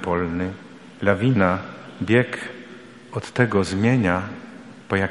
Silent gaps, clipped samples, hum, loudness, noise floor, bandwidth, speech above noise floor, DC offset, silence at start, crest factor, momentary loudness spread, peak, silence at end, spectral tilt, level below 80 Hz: none; under 0.1%; none; -22 LUFS; -42 dBFS; 11.5 kHz; 21 dB; 0.1%; 0 s; 20 dB; 21 LU; -2 dBFS; 0 s; -7 dB/octave; -52 dBFS